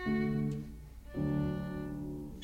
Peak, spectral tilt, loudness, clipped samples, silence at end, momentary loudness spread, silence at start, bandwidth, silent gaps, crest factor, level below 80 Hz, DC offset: -22 dBFS; -8.5 dB/octave; -37 LUFS; under 0.1%; 0 s; 12 LU; 0 s; 16 kHz; none; 14 dB; -50 dBFS; under 0.1%